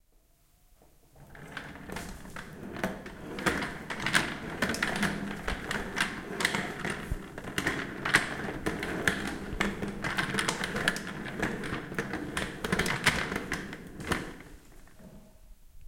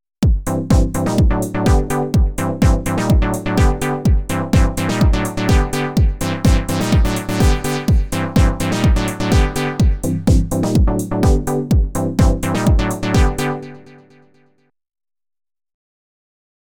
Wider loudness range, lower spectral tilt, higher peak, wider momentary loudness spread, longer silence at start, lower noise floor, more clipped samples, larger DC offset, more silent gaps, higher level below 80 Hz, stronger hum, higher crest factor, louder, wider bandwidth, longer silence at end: about the same, 3 LU vs 3 LU; second, -3.5 dB/octave vs -6 dB/octave; second, -8 dBFS vs -4 dBFS; first, 15 LU vs 3 LU; first, 1.15 s vs 0.2 s; first, -64 dBFS vs -60 dBFS; neither; neither; neither; second, -48 dBFS vs -20 dBFS; neither; first, 26 dB vs 12 dB; second, -32 LUFS vs -17 LUFS; second, 17 kHz vs 19 kHz; second, 0 s vs 2.95 s